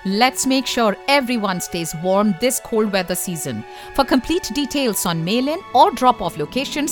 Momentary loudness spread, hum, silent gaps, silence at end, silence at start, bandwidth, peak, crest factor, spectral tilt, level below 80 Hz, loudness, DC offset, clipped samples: 8 LU; none; none; 0 s; 0 s; 19 kHz; -2 dBFS; 18 dB; -3.5 dB/octave; -46 dBFS; -19 LUFS; under 0.1%; under 0.1%